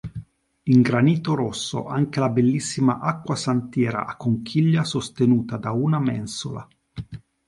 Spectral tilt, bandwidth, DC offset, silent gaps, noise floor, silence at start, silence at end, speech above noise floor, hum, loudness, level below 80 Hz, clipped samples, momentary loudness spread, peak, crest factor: -6.5 dB/octave; 11.5 kHz; under 0.1%; none; -41 dBFS; 0.05 s; 0.3 s; 20 dB; none; -22 LUFS; -54 dBFS; under 0.1%; 18 LU; -4 dBFS; 18 dB